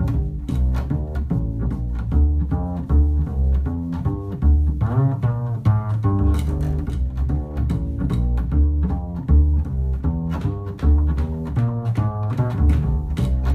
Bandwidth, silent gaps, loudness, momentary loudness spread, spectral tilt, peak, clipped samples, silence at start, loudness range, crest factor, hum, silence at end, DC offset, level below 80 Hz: 4.3 kHz; none; -22 LUFS; 6 LU; -9.5 dB/octave; -6 dBFS; under 0.1%; 0 s; 1 LU; 14 dB; none; 0 s; under 0.1%; -22 dBFS